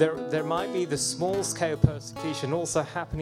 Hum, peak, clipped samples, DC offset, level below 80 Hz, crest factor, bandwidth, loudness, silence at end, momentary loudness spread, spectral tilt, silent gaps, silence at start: none; -4 dBFS; under 0.1%; under 0.1%; -48 dBFS; 24 dB; 15.5 kHz; -28 LUFS; 0 s; 7 LU; -4.5 dB/octave; none; 0 s